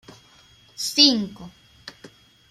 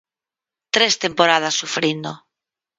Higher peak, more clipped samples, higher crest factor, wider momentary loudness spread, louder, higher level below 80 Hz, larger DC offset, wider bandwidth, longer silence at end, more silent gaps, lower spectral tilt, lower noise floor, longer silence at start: about the same, -2 dBFS vs 0 dBFS; neither; about the same, 24 dB vs 22 dB; first, 27 LU vs 9 LU; about the same, -18 LUFS vs -18 LUFS; about the same, -62 dBFS vs -66 dBFS; neither; first, 15.5 kHz vs 11 kHz; second, 0.45 s vs 0.6 s; neither; about the same, -2 dB/octave vs -2 dB/octave; second, -54 dBFS vs -89 dBFS; about the same, 0.8 s vs 0.75 s